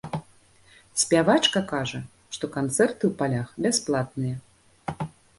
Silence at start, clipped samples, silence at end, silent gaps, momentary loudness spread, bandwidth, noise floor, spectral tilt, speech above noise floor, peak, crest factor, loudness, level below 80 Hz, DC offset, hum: 0.05 s; under 0.1%; 0.3 s; none; 17 LU; 12 kHz; -56 dBFS; -4 dB/octave; 32 dB; -6 dBFS; 22 dB; -25 LUFS; -58 dBFS; under 0.1%; none